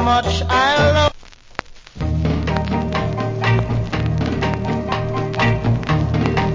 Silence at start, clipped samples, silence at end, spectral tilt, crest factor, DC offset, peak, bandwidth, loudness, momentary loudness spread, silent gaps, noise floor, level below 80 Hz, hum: 0 s; under 0.1%; 0 s; -6.5 dB/octave; 18 dB; under 0.1%; 0 dBFS; 7.6 kHz; -19 LUFS; 7 LU; none; -38 dBFS; -28 dBFS; none